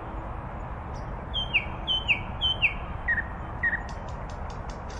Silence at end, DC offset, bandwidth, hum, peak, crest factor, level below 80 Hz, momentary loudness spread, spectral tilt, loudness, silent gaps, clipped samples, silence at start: 0 s; under 0.1%; 10.5 kHz; none; -12 dBFS; 18 dB; -38 dBFS; 13 LU; -4.5 dB/octave; -29 LUFS; none; under 0.1%; 0 s